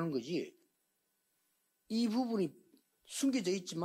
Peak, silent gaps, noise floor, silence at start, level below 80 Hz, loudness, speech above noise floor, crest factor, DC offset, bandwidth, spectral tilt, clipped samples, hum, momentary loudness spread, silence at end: -24 dBFS; none; -81 dBFS; 0 s; -82 dBFS; -36 LUFS; 46 dB; 14 dB; under 0.1%; 16 kHz; -5 dB/octave; under 0.1%; none; 7 LU; 0 s